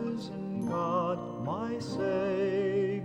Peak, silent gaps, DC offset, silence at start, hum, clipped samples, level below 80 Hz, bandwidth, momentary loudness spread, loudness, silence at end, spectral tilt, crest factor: -18 dBFS; none; under 0.1%; 0 s; none; under 0.1%; -64 dBFS; 12 kHz; 6 LU; -32 LUFS; 0 s; -7.5 dB/octave; 14 dB